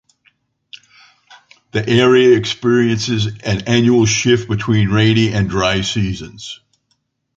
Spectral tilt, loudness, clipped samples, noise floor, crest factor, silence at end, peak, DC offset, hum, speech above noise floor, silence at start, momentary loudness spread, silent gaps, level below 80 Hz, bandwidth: -5 dB/octave; -14 LUFS; under 0.1%; -67 dBFS; 14 dB; 0.8 s; 0 dBFS; under 0.1%; none; 52 dB; 0.75 s; 12 LU; none; -40 dBFS; 7.8 kHz